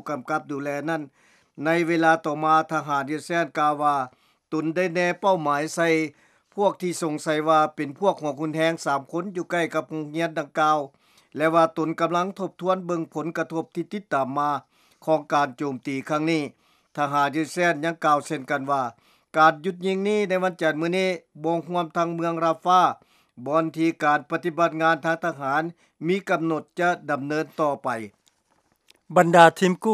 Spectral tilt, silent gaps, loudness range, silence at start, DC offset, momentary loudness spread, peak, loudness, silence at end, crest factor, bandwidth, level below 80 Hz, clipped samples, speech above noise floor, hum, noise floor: -5.5 dB/octave; none; 3 LU; 0.05 s; under 0.1%; 10 LU; 0 dBFS; -24 LUFS; 0 s; 24 dB; 14.5 kHz; -80 dBFS; under 0.1%; 44 dB; none; -67 dBFS